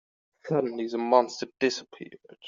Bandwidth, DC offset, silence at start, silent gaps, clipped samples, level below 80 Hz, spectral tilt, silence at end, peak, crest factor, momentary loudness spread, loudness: 7.6 kHz; under 0.1%; 0.45 s; none; under 0.1%; -76 dBFS; -4 dB/octave; 0 s; -6 dBFS; 22 dB; 22 LU; -27 LUFS